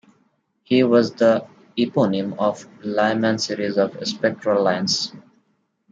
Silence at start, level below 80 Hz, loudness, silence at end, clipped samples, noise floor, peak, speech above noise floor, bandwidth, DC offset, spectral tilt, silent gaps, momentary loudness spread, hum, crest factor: 0.7 s; -70 dBFS; -20 LUFS; 0.7 s; under 0.1%; -67 dBFS; -4 dBFS; 47 dB; 9 kHz; under 0.1%; -5 dB/octave; none; 8 LU; none; 18 dB